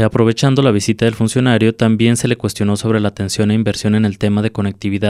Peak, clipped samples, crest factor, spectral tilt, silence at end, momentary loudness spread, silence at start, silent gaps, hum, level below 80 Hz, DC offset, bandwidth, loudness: -2 dBFS; under 0.1%; 14 dB; -6 dB/octave; 0 s; 5 LU; 0 s; none; none; -46 dBFS; under 0.1%; 13.5 kHz; -15 LUFS